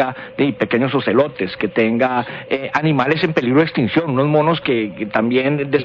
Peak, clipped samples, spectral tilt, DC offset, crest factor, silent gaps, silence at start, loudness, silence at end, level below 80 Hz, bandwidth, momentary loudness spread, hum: -4 dBFS; under 0.1%; -8 dB/octave; under 0.1%; 14 dB; none; 0 s; -17 LUFS; 0 s; -54 dBFS; 7.2 kHz; 5 LU; none